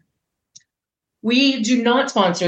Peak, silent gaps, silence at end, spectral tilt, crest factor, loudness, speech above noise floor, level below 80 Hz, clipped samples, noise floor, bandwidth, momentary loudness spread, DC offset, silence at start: -2 dBFS; none; 0 s; -4 dB/octave; 18 dB; -17 LUFS; 68 dB; -74 dBFS; under 0.1%; -85 dBFS; 8.6 kHz; 3 LU; under 0.1%; 1.25 s